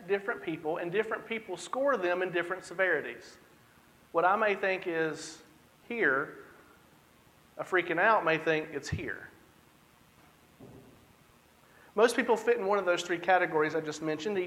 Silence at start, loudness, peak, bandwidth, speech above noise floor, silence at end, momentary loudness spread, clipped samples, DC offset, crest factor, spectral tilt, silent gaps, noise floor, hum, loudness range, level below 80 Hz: 0 s; -30 LUFS; -10 dBFS; 15.5 kHz; 31 dB; 0 s; 14 LU; under 0.1%; under 0.1%; 22 dB; -4.5 dB/octave; none; -62 dBFS; none; 5 LU; -66 dBFS